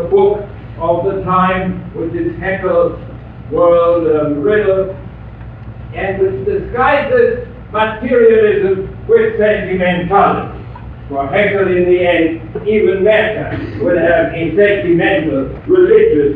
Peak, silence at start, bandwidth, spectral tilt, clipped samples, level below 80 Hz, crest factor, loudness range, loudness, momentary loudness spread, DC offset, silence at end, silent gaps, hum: 0 dBFS; 0 s; 4.6 kHz; -9.5 dB/octave; under 0.1%; -34 dBFS; 12 dB; 3 LU; -13 LUFS; 14 LU; under 0.1%; 0 s; none; none